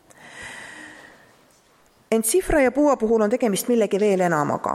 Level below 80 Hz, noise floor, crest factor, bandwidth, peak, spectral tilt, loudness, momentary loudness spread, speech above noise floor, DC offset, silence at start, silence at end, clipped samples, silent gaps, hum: -44 dBFS; -57 dBFS; 16 dB; 15.5 kHz; -6 dBFS; -4.5 dB/octave; -20 LUFS; 19 LU; 38 dB; under 0.1%; 0.25 s; 0 s; under 0.1%; none; none